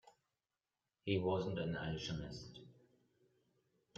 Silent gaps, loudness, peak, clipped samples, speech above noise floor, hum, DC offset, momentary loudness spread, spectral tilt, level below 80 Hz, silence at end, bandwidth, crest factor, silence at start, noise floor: none; -41 LUFS; -24 dBFS; under 0.1%; over 49 dB; none; under 0.1%; 16 LU; -6 dB/octave; -66 dBFS; 1.25 s; 7.8 kHz; 22 dB; 1.05 s; under -90 dBFS